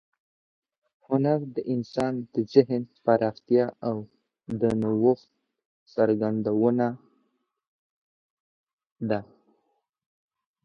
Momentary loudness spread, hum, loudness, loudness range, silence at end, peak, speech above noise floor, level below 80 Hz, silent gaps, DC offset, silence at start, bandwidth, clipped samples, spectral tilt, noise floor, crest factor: 9 LU; none; -26 LUFS; 12 LU; 1.4 s; -4 dBFS; 50 dB; -64 dBFS; 5.65-5.86 s, 7.68-8.67 s, 8.73-8.78 s, 8.92-8.96 s; under 0.1%; 1.1 s; 9 kHz; under 0.1%; -8.5 dB/octave; -75 dBFS; 24 dB